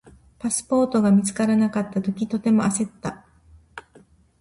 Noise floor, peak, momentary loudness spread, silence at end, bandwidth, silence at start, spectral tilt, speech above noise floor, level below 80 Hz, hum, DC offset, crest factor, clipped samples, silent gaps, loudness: -54 dBFS; -10 dBFS; 21 LU; 0.6 s; 11.5 kHz; 0.05 s; -6 dB/octave; 33 dB; -56 dBFS; none; under 0.1%; 14 dB; under 0.1%; none; -22 LUFS